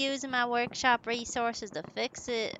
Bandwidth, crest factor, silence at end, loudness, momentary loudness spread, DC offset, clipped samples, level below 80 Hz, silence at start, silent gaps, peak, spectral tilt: 9.2 kHz; 20 dB; 0 s; -31 LUFS; 8 LU; under 0.1%; under 0.1%; -64 dBFS; 0 s; none; -12 dBFS; -2 dB/octave